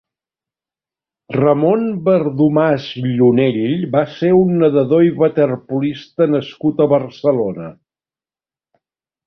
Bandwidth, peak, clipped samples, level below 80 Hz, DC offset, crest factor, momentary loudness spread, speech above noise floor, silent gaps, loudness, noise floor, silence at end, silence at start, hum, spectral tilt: 6.2 kHz; -2 dBFS; under 0.1%; -56 dBFS; under 0.1%; 14 dB; 8 LU; over 75 dB; none; -15 LUFS; under -90 dBFS; 1.55 s; 1.3 s; none; -9.5 dB/octave